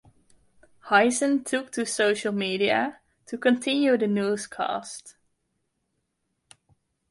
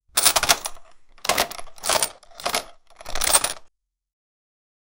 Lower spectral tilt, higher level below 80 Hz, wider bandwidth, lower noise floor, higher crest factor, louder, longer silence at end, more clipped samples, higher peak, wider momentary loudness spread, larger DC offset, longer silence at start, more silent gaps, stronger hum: first, -3.5 dB/octave vs 0.5 dB/octave; second, -70 dBFS vs -44 dBFS; second, 11.5 kHz vs 17.5 kHz; first, -77 dBFS vs -53 dBFS; second, 20 dB vs 26 dB; second, -24 LUFS vs -21 LUFS; first, 2 s vs 1.3 s; neither; second, -6 dBFS vs 0 dBFS; about the same, 11 LU vs 13 LU; neither; first, 0.85 s vs 0.15 s; neither; neither